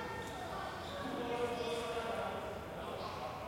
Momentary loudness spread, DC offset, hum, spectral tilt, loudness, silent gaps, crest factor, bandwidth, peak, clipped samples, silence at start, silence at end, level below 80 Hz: 5 LU; under 0.1%; none; -4.5 dB/octave; -41 LUFS; none; 14 dB; 16.5 kHz; -26 dBFS; under 0.1%; 0 s; 0 s; -60 dBFS